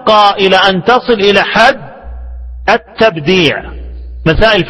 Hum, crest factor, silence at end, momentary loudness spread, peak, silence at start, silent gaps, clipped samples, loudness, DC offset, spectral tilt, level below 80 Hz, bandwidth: none; 10 dB; 0 s; 21 LU; 0 dBFS; 0 s; none; 0.7%; -9 LUFS; under 0.1%; -5 dB/octave; -26 dBFS; 11 kHz